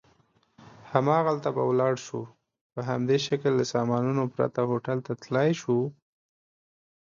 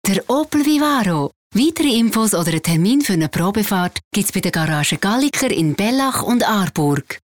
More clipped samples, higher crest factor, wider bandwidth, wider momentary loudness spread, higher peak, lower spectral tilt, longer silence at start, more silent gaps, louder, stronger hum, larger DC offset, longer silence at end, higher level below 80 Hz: neither; first, 22 dB vs 10 dB; second, 7.6 kHz vs 20 kHz; first, 10 LU vs 4 LU; about the same, -6 dBFS vs -8 dBFS; first, -6.5 dB/octave vs -4.5 dB/octave; first, 0.65 s vs 0.05 s; second, 2.61-2.70 s vs 1.36-1.50 s, 4.04-4.11 s; second, -27 LUFS vs -17 LUFS; neither; second, under 0.1% vs 0.2%; first, 1.3 s vs 0.1 s; second, -70 dBFS vs -48 dBFS